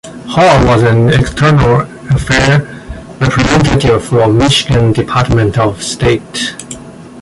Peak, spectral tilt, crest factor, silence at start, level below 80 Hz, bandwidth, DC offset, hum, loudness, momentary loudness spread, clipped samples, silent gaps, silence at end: 0 dBFS; -5.5 dB/octave; 10 dB; 0.05 s; -26 dBFS; 11.5 kHz; under 0.1%; none; -10 LUFS; 10 LU; under 0.1%; none; 0 s